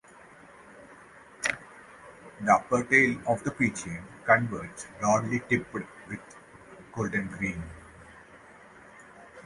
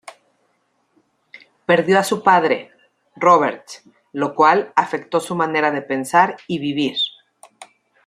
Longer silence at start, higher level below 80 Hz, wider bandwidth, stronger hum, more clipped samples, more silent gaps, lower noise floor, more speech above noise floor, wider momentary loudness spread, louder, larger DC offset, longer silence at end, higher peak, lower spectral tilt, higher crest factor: second, 0.7 s vs 1.35 s; first, -58 dBFS vs -68 dBFS; second, 11.5 kHz vs 15 kHz; neither; neither; neither; second, -52 dBFS vs -66 dBFS; second, 25 dB vs 49 dB; first, 26 LU vs 10 LU; second, -27 LUFS vs -18 LUFS; neither; second, 0.05 s vs 0.4 s; second, -6 dBFS vs -2 dBFS; about the same, -5 dB/octave vs -4.5 dB/octave; first, 24 dB vs 18 dB